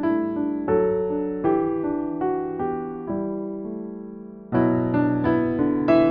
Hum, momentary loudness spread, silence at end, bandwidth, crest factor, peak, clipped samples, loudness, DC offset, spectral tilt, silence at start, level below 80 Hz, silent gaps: none; 11 LU; 0 s; 5 kHz; 16 dB; -6 dBFS; under 0.1%; -24 LUFS; under 0.1%; -8 dB/octave; 0 s; -50 dBFS; none